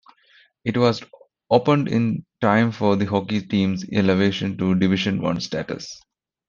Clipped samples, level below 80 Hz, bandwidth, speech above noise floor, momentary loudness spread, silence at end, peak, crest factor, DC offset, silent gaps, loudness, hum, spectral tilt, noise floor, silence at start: under 0.1%; -58 dBFS; 7.2 kHz; 36 dB; 11 LU; 0.5 s; -2 dBFS; 20 dB; under 0.1%; none; -21 LUFS; none; -6.5 dB/octave; -57 dBFS; 0.65 s